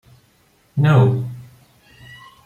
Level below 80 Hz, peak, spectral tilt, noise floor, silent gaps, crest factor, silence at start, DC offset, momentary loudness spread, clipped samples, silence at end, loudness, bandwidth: -56 dBFS; -2 dBFS; -9 dB/octave; -57 dBFS; none; 18 dB; 0.75 s; under 0.1%; 18 LU; under 0.1%; 1.05 s; -17 LUFS; 7 kHz